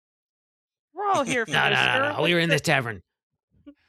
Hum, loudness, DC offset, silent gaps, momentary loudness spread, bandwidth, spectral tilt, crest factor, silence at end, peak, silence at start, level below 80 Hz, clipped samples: none; -22 LUFS; under 0.1%; 3.23-3.30 s, 3.43-3.48 s; 10 LU; 14 kHz; -4 dB/octave; 22 dB; 0.15 s; -4 dBFS; 0.95 s; -64 dBFS; under 0.1%